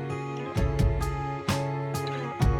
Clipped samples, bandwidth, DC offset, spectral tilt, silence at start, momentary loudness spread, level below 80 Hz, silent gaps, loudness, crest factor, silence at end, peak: under 0.1%; 16.5 kHz; under 0.1%; -6.5 dB/octave; 0 s; 6 LU; -32 dBFS; none; -29 LUFS; 14 dB; 0 s; -12 dBFS